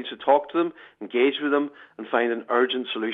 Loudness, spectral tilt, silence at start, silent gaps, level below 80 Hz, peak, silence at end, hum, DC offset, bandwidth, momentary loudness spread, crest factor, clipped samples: -24 LUFS; -6.5 dB/octave; 0 s; none; -78 dBFS; -6 dBFS; 0 s; none; under 0.1%; 4 kHz; 10 LU; 18 dB; under 0.1%